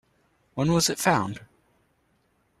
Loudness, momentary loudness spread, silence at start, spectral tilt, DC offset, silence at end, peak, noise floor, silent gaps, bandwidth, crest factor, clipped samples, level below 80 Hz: -24 LUFS; 17 LU; 0.55 s; -4 dB/octave; under 0.1%; 1.15 s; -6 dBFS; -68 dBFS; none; 14.5 kHz; 22 dB; under 0.1%; -56 dBFS